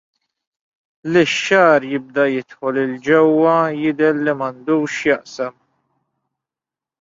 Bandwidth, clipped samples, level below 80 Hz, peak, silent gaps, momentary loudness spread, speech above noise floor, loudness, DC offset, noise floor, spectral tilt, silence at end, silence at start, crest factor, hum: 7.8 kHz; under 0.1%; -64 dBFS; -2 dBFS; none; 10 LU; 72 dB; -17 LUFS; under 0.1%; -89 dBFS; -5 dB/octave; 1.5 s; 1.05 s; 16 dB; none